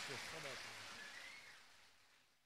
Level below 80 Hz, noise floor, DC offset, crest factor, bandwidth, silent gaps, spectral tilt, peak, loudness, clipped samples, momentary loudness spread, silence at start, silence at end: -82 dBFS; -73 dBFS; under 0.1%; 20 dB; 15.5 kHz; none; -1.5 dB/octave; -34 dBFS; -51 LUFS; under 0.1%; 19 LU; 0 s; 0 s